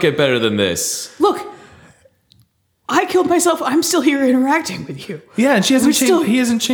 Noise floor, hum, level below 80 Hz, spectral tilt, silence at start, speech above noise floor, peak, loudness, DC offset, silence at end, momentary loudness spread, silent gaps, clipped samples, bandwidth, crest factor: -58 dBFS; none; -58 dBFS; -3.5 dB/octave; 0 s; 43 dB; -2 dBFS; -15 LUFS; under 0.1%; 0 s; 13 LU; none; under 0.1%; over 20 kHz; 14 dB